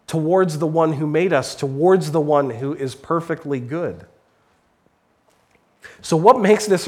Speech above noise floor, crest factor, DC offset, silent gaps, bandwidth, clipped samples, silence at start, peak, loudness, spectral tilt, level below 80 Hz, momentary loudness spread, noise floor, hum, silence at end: 43 dB; 20 dB; under 0.1%; none; 15 kHz; under 0.1%; 0.1 s; 0 dBFS; -19 LUFS; -6 dB/octave; -62 dBFS; 12 LU; -62 dBFS; none; 0 s